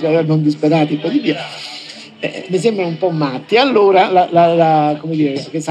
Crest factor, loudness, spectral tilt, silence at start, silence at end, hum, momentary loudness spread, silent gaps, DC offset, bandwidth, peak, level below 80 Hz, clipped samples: 14 dB; -14 LUFS; -6.5 dB/octave; 0 s; 0 s; none; 14 LU; none; under 0.1%; 10 kHz; 0 dBFS; -74 dBFS; under 0.1%